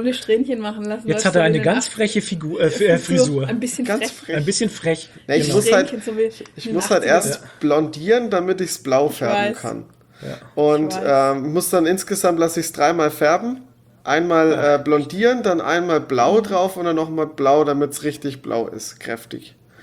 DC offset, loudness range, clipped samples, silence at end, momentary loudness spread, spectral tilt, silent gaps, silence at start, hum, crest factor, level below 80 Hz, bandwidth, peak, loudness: under 0.1%; 2 LU; under 0.1%; 0.35 s; 12 LU; -4.5 dB/octave; none; 0 s; none; 18 dB; -58 dBFS; 19.5 kHz; -2 dBFS; -19 LUFS